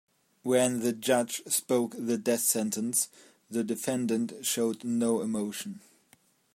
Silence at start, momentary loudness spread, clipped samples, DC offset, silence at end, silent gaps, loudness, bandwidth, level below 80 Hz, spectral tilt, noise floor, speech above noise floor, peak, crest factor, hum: 0.45 s; 9 LU; under 0.1%; under 0.1%; 0.75 s; none; -29 LUFS; 16 kHz; -76 dBFS; -3.5 dB/octave; -65 dBFS; 36 dB; -12 dBFS; 18 dB; none